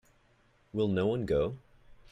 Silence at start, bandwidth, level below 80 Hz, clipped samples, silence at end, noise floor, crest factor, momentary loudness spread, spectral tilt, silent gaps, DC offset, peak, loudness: 0.75 s; 10.5 kHz; -54 dBFS; under 0.1%; 0.2 s; -67 dBFS; 16 dB; 10 LU; -8.5 dB/octave; none; under 0.1%; -18 dBFS; -31 LUFS